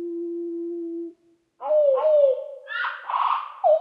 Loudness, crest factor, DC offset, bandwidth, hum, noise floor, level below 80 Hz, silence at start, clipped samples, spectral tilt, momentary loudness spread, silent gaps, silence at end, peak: -24 LUFS; 14 dB; under 0.1%; 5 kHz; none; -58 dBFS; under -90 dBFS; 0 s; under 0.1%; -4.5 dB/octave; 14 LU; none; 0 s; -10 dBFS